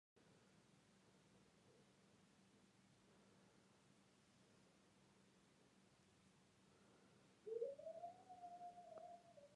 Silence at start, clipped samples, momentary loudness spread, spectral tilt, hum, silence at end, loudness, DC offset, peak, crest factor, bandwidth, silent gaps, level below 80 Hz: 0.15 s; under 0.1%; 12 LU; -5 dB/octave; none; 0 s; -56 LUFS; under 0.1%; -38 dBFS; 24 dB; 11 kHz; none; under -90 dBFS